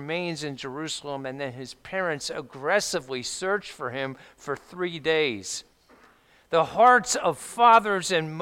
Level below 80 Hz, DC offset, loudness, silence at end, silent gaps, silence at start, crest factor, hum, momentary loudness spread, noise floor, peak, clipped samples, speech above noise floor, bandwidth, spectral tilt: -64 dBFS; under 0.1%; -25 LUFS; 0 s; none; 0 s; 20 dB; none; 17 LU; -58 dBFS; -6 dBFS; under 0.1%; 33 dB; 16.5 kHz; -3 dB/octave